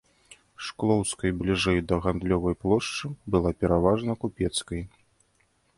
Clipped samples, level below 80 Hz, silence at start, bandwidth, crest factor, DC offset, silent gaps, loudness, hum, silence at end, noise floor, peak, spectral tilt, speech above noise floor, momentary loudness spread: under 0.1%; -42 dBFS; 0.3 s; 11.5 kHz; 20 dB; under 0.1%; none; -26 LUFS; none; 0.9 s; -68 dBFS; -8 dBFS; -5.5 dB/octave; 42 dB; 11 LU